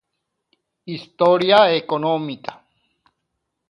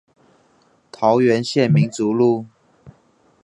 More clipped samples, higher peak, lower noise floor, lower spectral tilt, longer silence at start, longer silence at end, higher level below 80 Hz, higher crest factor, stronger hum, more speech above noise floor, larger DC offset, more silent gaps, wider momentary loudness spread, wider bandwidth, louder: neither; about the same, 0 dBFS vs -2 dBFS; first, -77 dBFS vs -58 dBFS; about the same, -6.5 dB/octave vs -7 dB/octave; second, 0.85 s vs 1 s; first, 1.15 s vs 0.55 s; second, -70 dBFS vs -62 dBFS; about the same, 20 dB vs 18 dB; neither; first, 59 dB vs 42 dB; neither; neither; first, 19 LU vs 4 LU; about the same, 11 kHz vs 10.5 kHz; about the same, -17 LUFS vs -18 LUFS